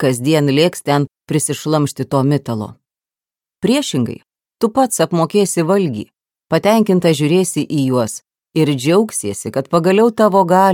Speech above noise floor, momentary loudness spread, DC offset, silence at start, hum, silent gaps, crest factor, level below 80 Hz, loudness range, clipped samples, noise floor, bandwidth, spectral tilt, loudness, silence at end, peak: over 75 dB; 10 LU; under 0.1%; 0 s; none; none; 16 dB; -58 dBFS; 4 LU; under 0.1%; under -90 dBFS; 18.5 kHz; -5.5 dB/octave; -15 LUFS; 0 s; 0 dBFS